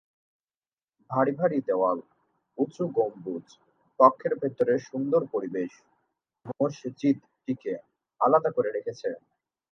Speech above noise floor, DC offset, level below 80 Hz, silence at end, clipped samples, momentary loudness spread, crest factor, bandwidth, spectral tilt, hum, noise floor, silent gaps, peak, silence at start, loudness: over 64 dB; under 0.1%; -78 dBFS; 0.55 s; under 0.1%; 15 LU; 26 dB; 7.2 kHz; -8 dB/octave; none; under -90 dBFS; none; -4 dBFS; 1.1 s; -27 LUFS